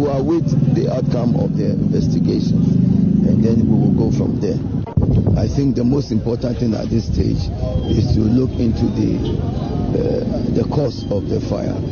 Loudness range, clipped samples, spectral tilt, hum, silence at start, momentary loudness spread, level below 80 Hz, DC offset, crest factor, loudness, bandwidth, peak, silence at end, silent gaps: 3 LU; under 0.1%; -9 dB/octave; none; 0 s; 6 LU; -30 dBFS; under 0.1%; 14 dB; -17 LUFS; 7 kHz; -2 dBFS; 0 s; none